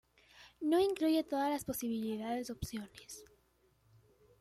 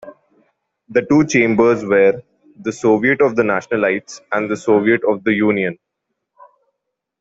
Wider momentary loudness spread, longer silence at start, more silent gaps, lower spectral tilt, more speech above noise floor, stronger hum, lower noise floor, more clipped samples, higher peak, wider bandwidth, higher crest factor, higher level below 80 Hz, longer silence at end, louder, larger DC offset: first, 18 LU vs 10 LU; first, 0.35 s vs 0.05 s; neither; about the same, -5 dB/octave vs -6 dB/octave; second, 37 dB vs 62 dB; neither; second, -72 dBFS vs -77 dBFS; neither; second, -20 dBFS vs -2 dBFS; first, 15.5 kHz vs 8 kHz; about the same, 16 dB vs 16 dB; second, -64 dBFS vs -56 dBFS; second, 1.15 s vs 1.45 s; second, -36 LUFS vs -16 LUFS; neither